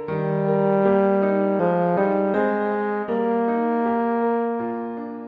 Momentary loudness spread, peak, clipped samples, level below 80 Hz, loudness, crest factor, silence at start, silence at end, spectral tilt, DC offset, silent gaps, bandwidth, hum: 6 LU; -6 dBFS; under 0.1%; -62 dBFS; -21 LUFS; 16 dB; 0 s; 0 s; -10.5 dB/octave; under 0.1%; none; 4.9 kHz; none